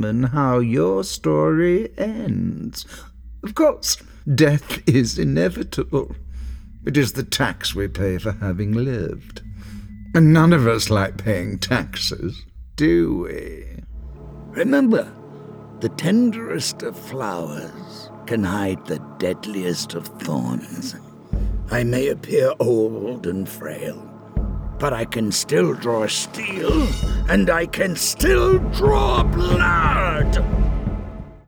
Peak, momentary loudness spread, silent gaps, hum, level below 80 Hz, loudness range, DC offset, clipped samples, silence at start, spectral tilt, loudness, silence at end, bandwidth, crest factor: -2 dBFS; 18 LU; none; none; -30 dBFS; 7 LU; under 0.1%; under 0.1%; 0 s; -5.5 dB/octave; -20 LUFS; 0.1 s; over 20 kHz; 18 dB